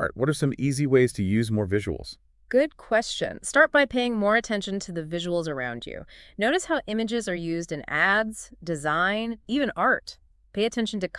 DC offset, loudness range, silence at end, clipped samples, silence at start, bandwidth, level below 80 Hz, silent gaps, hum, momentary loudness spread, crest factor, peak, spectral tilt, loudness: under 0.1%; 3 LU; 0 s; under 0.1%; 0 s; 12 kHz; -52 dBFS; none; none; 12 LU; 20 dB; -6 dBFS; -5 dB/octave; -25 LUFS